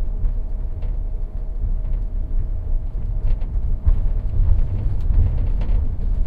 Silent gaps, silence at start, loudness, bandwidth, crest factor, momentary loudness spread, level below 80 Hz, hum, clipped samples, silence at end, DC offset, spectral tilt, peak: none; 0 s; -25 LUFS; 2.4 kHz; 14 dB; 8 LU; -20 dBFS; none; under 0.1%; 0 s; under 0.1%; -10.5 dB/octave; -4 dBFS